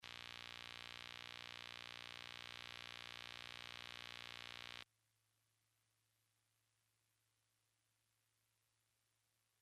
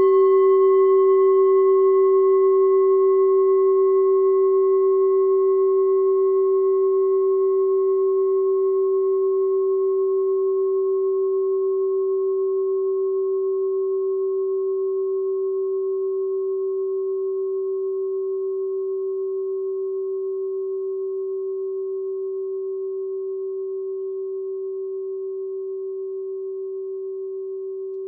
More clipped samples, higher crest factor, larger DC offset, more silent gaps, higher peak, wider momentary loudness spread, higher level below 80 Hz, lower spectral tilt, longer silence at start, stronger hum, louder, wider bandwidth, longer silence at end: neither; first, 24 dB vs 10 dB; neither; neither; second, -32 dBFS vs -10 dBFS; second, 0 LU vs 13 LU; first, -82 dBFS vs under -90 dBFS; second, -1.5 dB/octave vs -5.5 dB/octave; about the same, 0 s vs 0 s; neither; second, -52 LUFS vs -21 LUFS; first, 13 kHz vs 2.1 kHz; first, 4.75 s vs 0 s